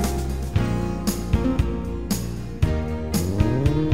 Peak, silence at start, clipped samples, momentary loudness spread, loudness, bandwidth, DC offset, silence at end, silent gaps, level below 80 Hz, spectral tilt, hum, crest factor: -4 dBFS; 0 s; under 0.1%; 6 LU; -24 LUFS; 16 kHz; 1%; 0 s; none; -28 dBFS; -6.5 dB/octave; none; 18 dB